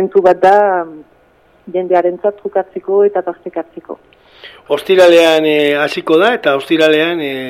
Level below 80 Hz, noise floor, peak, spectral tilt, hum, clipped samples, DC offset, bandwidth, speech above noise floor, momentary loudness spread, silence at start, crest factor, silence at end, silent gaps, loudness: -58 dBFS; -50 dBFS; 0 dBFS; -4.5 dB/octave; none; under 0.1%; under 0.1%; 15.5 kHz; 38 dB; 16 LU; 0 s; 12 dB; 0 s; none; -12 LUFS